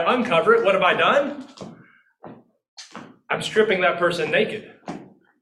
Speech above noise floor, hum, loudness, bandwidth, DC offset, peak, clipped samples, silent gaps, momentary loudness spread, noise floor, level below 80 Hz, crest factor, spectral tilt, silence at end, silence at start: 33 dB; none; -19 LUFS; 12 kHz; under 0.1%; -4 dBFS; under 0.1%; 2.68-2.77 s; 23 LU; -53 dBFS; -64 dBFS; 18 dB; -4.5 dB/octave; 0.35 s; 0 s